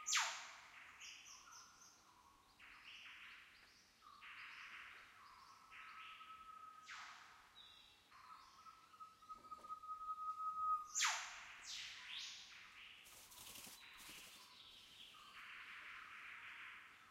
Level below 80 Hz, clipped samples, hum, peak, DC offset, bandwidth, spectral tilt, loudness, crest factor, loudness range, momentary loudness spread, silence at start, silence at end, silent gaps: -84 dBFS; under 0.1%; none; -24 dBFS; under 0.1%; 16 kHz; 2 dB/octave; -50 LUFS; 28 dB; 14 LU; 20 LU; 0 s; 0 s; none